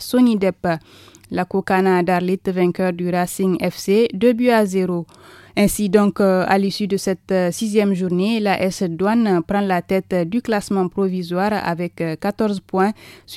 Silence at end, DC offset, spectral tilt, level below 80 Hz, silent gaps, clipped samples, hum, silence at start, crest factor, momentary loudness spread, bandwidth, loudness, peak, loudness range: 0 s; under 0.1%; -6 dB/octave; -50 dBFS; none; under 0.1%; none; 0 s; 18 dB; 7 LU; 15.5 kHz; -19 LUFS; 0 dBFS; 3 LU